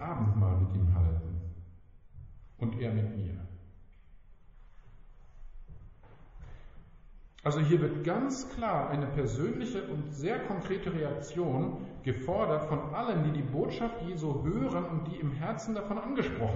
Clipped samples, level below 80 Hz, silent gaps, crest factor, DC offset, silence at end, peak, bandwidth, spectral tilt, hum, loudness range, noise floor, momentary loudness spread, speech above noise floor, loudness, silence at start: under 0.1%; -46 dBFS; none; 18 dB; under 0.1%; 0 s; -14 dBFS; 7.6 kHz; -7.5 dB/octave; none; 8 LU; -54 dBFS; 11 LU; 22 dB; -33 LUFS; 0 s